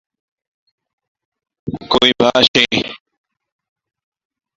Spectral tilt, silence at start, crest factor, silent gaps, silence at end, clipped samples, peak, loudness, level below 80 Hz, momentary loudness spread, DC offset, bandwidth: -3.5 dB/octave; 1.65 s; 20 dB; 2.48-2.54 s; 1.65 s; under 0.1%; 0 dBFS; -13 LUFS; -50 dBFS; 17 LU; under 0.1%; 10.5 kHz